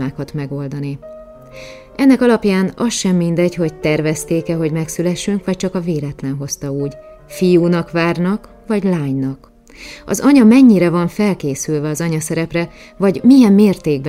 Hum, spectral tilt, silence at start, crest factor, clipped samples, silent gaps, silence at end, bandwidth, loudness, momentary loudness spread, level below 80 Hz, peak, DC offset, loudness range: none; -6 dB/octave; 0 s; 14 dB; under 0.1%; none; 0 s; 16 kHz; -15 LUFS; 15 LU; -46 dBFS; 0 dBFS; under 0.1%; 5 LU